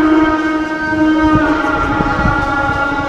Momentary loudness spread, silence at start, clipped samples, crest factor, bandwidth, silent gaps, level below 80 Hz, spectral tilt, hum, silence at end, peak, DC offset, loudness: 4 LU; 0 s; under 0.1%; 12 dB; 8.4 kHz; none; -28 dBFS; -6.5 dB/octave; none; 0 s; 0 dBFS; 0.2%; -14 LUFS